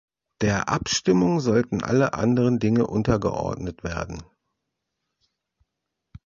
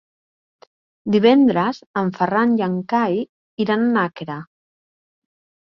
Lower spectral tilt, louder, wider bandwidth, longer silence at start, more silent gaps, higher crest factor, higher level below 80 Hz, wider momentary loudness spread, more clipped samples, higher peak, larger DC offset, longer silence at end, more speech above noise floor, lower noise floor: second, -5.5 dB/octave vs -8 dB/octave; second, -23 LUFS vs -19 LUFS; first, 7.6 kHz vs 6.2 kHz; second, 0.4 s vs 1.05 s; second, none vs 1.86-1.94 s, 3.29-3.57 s; about the same, 18 dB vs 18 dB; first, -46 dBFS vs -64 dBFS; second, 11 LU vs 17 LU; neither; second, -6 dBFS vs -2 dBFS; neither; first, 2 s vs 1.3 s; second, 60 dB vs over 72 dB; second, -82 dBFS vs under -90 dBFS